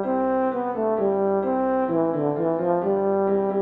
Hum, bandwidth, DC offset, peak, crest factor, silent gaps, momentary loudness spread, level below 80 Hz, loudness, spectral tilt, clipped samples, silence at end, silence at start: none; 4 kHz; under 0.1%; -10 dBFS; 12 dB; none; 2 LU; -58 dBFS; -23 LUFS; -11 dB/octave; under 0.1%; 0 s; 0 s